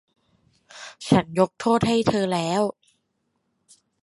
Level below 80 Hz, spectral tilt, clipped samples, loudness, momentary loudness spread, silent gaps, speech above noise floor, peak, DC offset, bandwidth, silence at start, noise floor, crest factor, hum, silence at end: -54 dBFS; -6 dB/octave; under 0.1%; -22 LUFS; 15 LU; none; 52 dB; -4 dBFS; under 0.1%; 11.5 kHz; 0.75 s; -74 dBFS; 22 dB; none; 1.3 s